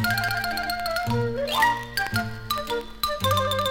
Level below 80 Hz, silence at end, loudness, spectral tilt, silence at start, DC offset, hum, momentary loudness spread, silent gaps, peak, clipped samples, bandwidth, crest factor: -46 dBFS; 0 s; -25 LUFS; -4 dB/octave; 0 s; under 0.1%; none; 7 LU; none; -6 dBFS; under 0.1%; 17 kHz; 20 dB